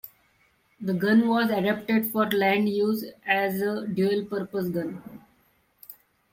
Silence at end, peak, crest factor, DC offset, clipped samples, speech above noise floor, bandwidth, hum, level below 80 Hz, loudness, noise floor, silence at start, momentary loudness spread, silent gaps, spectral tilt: 0.4 s; -8 dBFS; 20 dB; under 0.1%; under 0.1%; 41 dB; 16.5 kHz; none; -68 dBFS; -25 LUFS; -65 dBFS; 0.05 s; 15 LU; none; -6.5 dB/octave